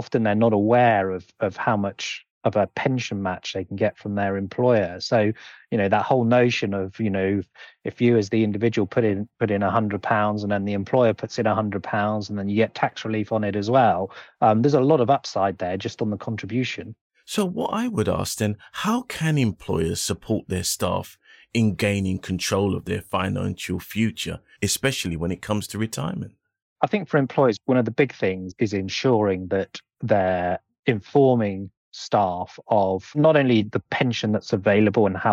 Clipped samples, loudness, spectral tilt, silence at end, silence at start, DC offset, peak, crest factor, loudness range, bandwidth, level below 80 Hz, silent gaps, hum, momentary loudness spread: under 0.1%; -23 LUFS; -5.5 dB/octave; 0 s; 0 s; under 0.1%; -4 dBFS; 18 dB; 4 LU; 16.5 kHz; -54 dBFS; 2.30-2.41 s, 17.01-17.10 s, 26.62-26.76 s, 30.79-30.83 s, 31.77-31.92 s; none; 10 LU